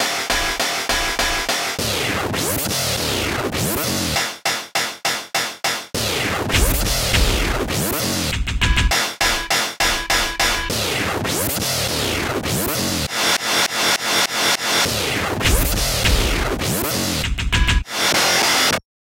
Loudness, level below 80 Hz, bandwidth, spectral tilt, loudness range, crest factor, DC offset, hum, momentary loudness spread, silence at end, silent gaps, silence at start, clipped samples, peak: -18 LUFS; -28 dBFS; 17 kHz; -2.5 dB/octave; 3 LU; 16 dB; under 0.1%; none; 5 LU; 0.2 s; none; 0 s; under 0.1%; -4 dBFS